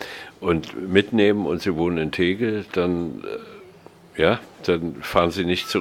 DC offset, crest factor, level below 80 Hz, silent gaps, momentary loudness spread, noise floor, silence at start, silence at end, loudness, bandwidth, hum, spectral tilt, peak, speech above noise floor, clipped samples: under 0.1%; 20 dB; -48 dBFS; none; 13 LU; -47 dBFS; 0 s; 0 s; -22 LUFS; 16.5 kHz; none; -6 dB/octave; -2 dBFS; 25 dB; under 0.1%